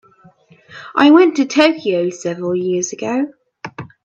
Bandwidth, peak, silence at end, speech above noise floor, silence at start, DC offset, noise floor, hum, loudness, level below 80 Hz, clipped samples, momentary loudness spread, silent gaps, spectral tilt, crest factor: 8 kHz; 0 dBFS; 0.2 s; 34 dB; 0.7 s; under 0.1%; -48 dBFS; none; -15 LUFS; -64 dBFS; under 0.1%; 21 LU; none; -4.5 dB/octave; 16 dB